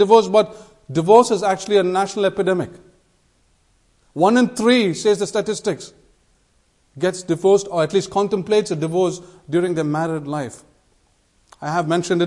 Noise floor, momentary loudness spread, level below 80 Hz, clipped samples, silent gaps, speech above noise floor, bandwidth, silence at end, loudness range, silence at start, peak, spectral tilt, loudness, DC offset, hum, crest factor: -61 dBFS; 13 LU; -60 dBFS; under 0.1%; none; 43 dB; 11.5 kHz; 0 s; 3 LU; 0 s; 0 dBFS; -5 dB/octave; -19 LUFS; under 0.1%; none; 20 dB